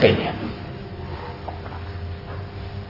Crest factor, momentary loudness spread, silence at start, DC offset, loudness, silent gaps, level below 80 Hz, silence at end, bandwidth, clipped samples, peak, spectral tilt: 24 dB; 9 LU; 0 s; under 0.1%; -29 LUFS; none; -44 dBFS; 0 s; 5.8 kHz; under 0.1%; -2 dBFS; -8 dB/octave